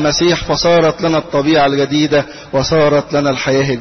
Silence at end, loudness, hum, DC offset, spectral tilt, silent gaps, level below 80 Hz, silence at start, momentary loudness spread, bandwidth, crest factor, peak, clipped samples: 0 s; -13 LUFS; none; under 0.1%; -5 dB/octave; none; -38 dBFS; 0 s; 4 LU; 6.4 kHz; 10 dB; -4 dBFS; under 0.1%